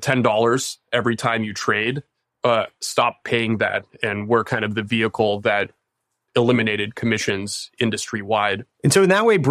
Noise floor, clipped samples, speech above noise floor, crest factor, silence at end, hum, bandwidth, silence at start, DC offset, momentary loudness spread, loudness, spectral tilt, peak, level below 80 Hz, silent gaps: -77 dBFS; under 0.1%; 57 dB; 18 dB; 0 s; none; 15.5 kHz; 0 s; under 0.1%; 8 LU; -20 LUFS; -4.5 dB/octave; -2 dBFS; -60 dBFS; none